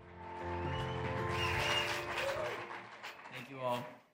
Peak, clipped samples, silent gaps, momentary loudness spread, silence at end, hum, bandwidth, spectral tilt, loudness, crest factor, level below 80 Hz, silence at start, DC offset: -22 dBFS; under 0.1%; none; 15 LU; 0.1 s; none; 16 kHz; -4 dB/octave; -38 LUFS; 18 dB; -58 dBFS; 0 s; under 0.1%